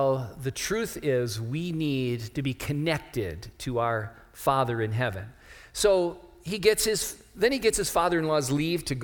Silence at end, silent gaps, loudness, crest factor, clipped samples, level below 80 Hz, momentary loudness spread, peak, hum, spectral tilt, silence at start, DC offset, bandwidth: 0 s; none; -27 LUFS; 20 dB; under 0.1%; -50 dBFS; 10 LU; -8 dBFS; none; -4.5 dB/octave; 0 s; under 0.1%; 20 kHz